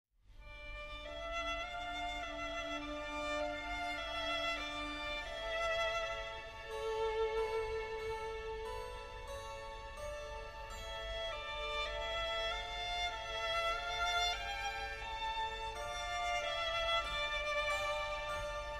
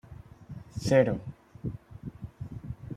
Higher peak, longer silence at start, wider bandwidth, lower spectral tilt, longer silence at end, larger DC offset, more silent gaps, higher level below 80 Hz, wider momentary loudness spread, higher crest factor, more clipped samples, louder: second, -24 dBFS vs -8 dBFS; about the same, 0.05 s vs 0.05 s; first, 15.5 kHz vs 13 kHz; second, -2.5 dB/octave vs -7 dB/octave; about the same, 0 s vs 0 s; neither; neither; about the same, -52 dBFS vs -52 dBFS; second, 11 LU vs 22 LU; second, 16 dB vs 24 dB; neither; second, -39 LUFS vs -29 LUFS